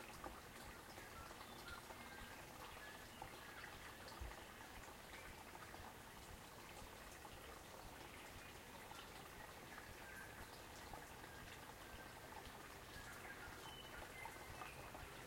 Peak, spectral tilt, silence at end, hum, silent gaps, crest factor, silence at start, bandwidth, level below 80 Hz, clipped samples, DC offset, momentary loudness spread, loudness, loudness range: -38 dBFS; -3 dB/octave; 0 s; none; none; 18 dB; 0 s; 16.5 kHz; -66 dBFS; under 0.1%; under 0.1%; 3 LU; -56 LUFS; 2 LU